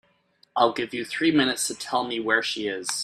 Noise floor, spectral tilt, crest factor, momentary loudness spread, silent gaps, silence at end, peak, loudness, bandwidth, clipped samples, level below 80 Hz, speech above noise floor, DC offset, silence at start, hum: -63 dBFS; -2.5 dB/octave; 20 dB; 8 LU; none; 0 s; -6 dBFS; -24 LUFS; 14.5 kHz; under 0.1%; -68 dBFS; 39 dB; under 0.1%; 0.55 s; none